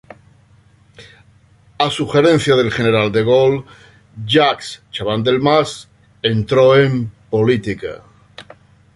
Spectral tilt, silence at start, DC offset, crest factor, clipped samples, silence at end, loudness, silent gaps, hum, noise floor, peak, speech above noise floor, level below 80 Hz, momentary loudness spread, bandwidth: -6 dB/octave; 1 s; under 0.1%; 16 dB; under 0.1%; 0.55 s; -15 LUFS; none; none; -50 dBFS; 0 dBFS; 35 dB; -48 dBFS; 13 LU; 11.5 kHz